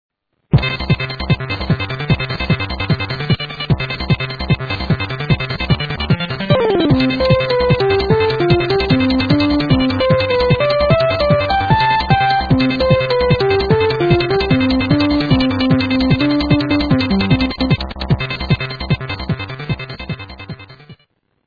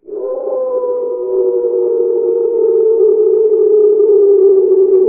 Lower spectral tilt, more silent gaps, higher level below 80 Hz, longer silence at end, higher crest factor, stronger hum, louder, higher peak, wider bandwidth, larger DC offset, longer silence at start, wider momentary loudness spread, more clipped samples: first, -8.5 dB/octave vs -5.5 dB/octave; neither; first, -30 dBFS vs -62 dBFS; first, 0.55 s vs 0 s; about the same, 14 dB vs 10 dB; neither; second, -15 LUFS vs -12 LUFS; about the same, 0 dBFS vs -2 dBFS; first, 5 kHz vs 1.5 kHz; neither; first, 0.5 s vs 0.1 s; second, 6 LU vs 9 LU; neither